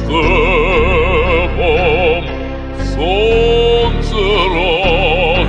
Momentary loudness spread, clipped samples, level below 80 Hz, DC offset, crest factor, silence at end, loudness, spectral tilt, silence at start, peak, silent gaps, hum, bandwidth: 7 LU; under 0.1%; -18 dBFS; under 0.1%; 10 dB; 0 s; -13 LUFS; -6 dB/octave; 0 s; -2 dBFS; none; none; 8.4 kHz